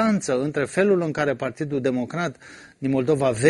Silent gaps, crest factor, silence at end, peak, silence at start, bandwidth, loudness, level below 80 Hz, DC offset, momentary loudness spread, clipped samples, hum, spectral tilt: none; 18 dB; 0 s; -4 dBFS; 0 s; 11.5 kHz; -23 LUFS; -58 dBFS; under 0.1%; 8 LU; under 0.1%; none; -6 dB/octave